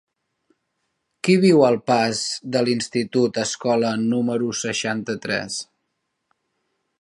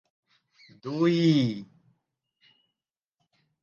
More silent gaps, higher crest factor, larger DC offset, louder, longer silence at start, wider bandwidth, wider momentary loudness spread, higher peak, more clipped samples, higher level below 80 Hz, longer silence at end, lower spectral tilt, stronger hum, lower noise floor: neither; about the same, 20 dB vs 18 dB; neither; first, -21 LUFS vs -25 LUFS; first, 1.25 s vs 0.85 s; first, 11.5 kHz vs 7.2 kHz; second, 10 LU vs 18 LU; first, -2 dBFS vs -12 dBFS; neither; first, -66 dBFS vs -74 dBFS; second, 1.4 s vs 2 s; second, -4.5 dB/octave vs -7.5 dB/octave; neither; second, -76 dBFS vs -89 dBFS